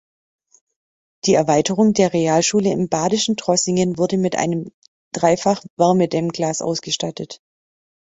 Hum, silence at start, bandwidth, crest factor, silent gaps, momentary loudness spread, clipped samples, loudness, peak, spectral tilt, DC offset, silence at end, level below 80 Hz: none; 1.25 s; 8.2 kHz; 18 dB; 4.74-4.82 s, 4.88-5.11 s, 5.70-5.77 s; 8 LU; under 0.1%; -18 LUFS; -2 dBFS; -4.5 dB/octave; under 0.1%; 0.65 s; -58 dBFS